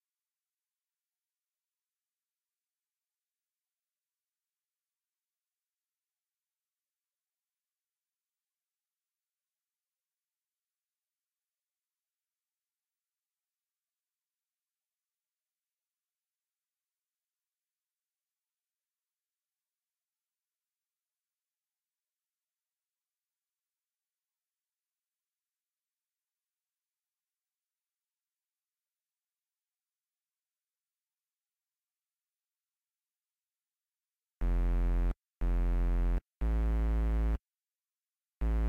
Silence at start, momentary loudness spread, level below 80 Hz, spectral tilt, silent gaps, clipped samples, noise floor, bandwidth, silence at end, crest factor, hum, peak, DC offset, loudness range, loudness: 34.4 s; 7 LU; -40 dBFS; -9 dB/octave; none; under 0.1%; under -90 dBFS; 3.4 kHz; 0 s; 16 dB; none; -26 dBFS; under 0.1%; 7 LU; -35 LUFS